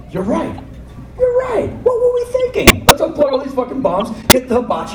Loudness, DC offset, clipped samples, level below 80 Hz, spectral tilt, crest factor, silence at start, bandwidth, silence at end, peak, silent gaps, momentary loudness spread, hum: -14 LUFS; under 0.1%; 1%; -30 dBFS; -3.5 dB/octave; 14 dB; 0 s; 17 kHz; 0 s; 0 dBFS; none; 10 LU; none